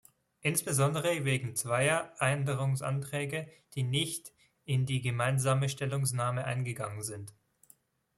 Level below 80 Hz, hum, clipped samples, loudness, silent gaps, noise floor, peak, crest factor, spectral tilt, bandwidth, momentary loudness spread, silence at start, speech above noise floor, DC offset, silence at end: -68 dBFS; none; under 0.1%; -32 LUFS; none; -65 dBFS; -12 dBFS; 20 dB; -4.5 dB/octave; 15 kHz; 11 LU; 0.45 s; 34 dB; under 0.1%; 0.9 s